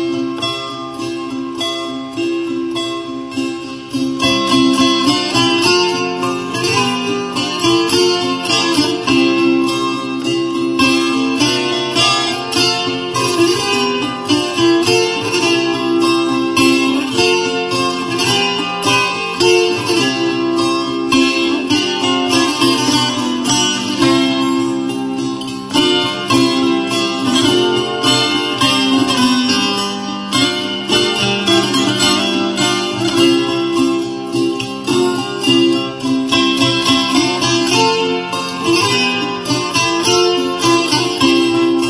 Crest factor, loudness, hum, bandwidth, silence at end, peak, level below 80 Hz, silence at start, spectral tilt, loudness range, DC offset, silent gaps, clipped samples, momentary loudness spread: 14 dB; -14 LUFS; none; 11 kHz; 0 s; 0 dBFS; -50 dBFS; 0 s; -3.5 dB/octave; 2 LU; under 0.1%; none; under 0.1%; 7 LU